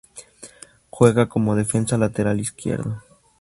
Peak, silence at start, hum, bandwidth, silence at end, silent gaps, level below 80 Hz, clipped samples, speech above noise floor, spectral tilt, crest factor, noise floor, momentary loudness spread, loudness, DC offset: 0 dBFS; 0.15 s; none; 11.5 kHz; 0.4 s; none; -50 dBFS; under 0.1%; 25 dB; -6.5 dB/octave; 22 dB; -45 dBFS; 23 LU; -21 LUFS; under 0.1%